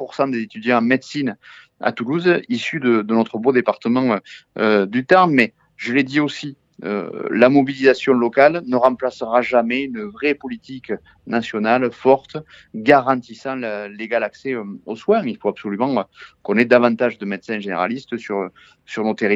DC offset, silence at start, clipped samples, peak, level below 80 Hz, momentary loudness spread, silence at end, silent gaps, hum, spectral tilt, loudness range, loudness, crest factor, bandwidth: under 0.1%; 0 s; under 0.1%; 0 dBFS; -64 dBFS; 15 LU; 0 s; none; none; -6.5 dB/octave; 4 LU; -19 LUFS; 18 dB; 7.8 kHz